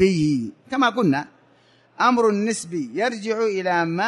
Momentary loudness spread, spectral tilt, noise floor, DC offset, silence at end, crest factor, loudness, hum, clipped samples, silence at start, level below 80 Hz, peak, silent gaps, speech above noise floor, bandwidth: 8 LU; -5.5 dB/octave; -57 dBFS; under 0.1%; 0 s; 16 dB; -22 LUFS; none; under 0.1%; 0 s; -60 dBFS; -6 dBFS; none; 36 dB; 11.5 kHz